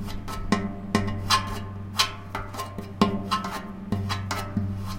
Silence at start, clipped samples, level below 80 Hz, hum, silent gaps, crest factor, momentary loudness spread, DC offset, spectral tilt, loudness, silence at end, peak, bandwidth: 0 s; under 0.1%; -42 dBFS; none; none; 26 dB; 11 LU; under 0.1%; -4.5 dB/octave; -28 LUFS; 0 s; -2 dBFS; 17 kHz